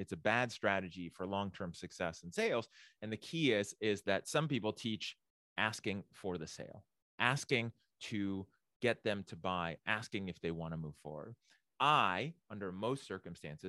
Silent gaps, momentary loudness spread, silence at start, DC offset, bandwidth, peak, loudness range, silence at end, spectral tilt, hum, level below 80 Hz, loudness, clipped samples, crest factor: 5.30-5.56 s, 7.02-7.18 s, 8.76-8.80 s; 13 LU; 0 s; under 0.1%; 12.5 kHz; -12 dBFS; 3 LU; 0 s; -4.5 dB/octave; none; -72 dBFS; -38 LUFS; under 0.1%; 26 dB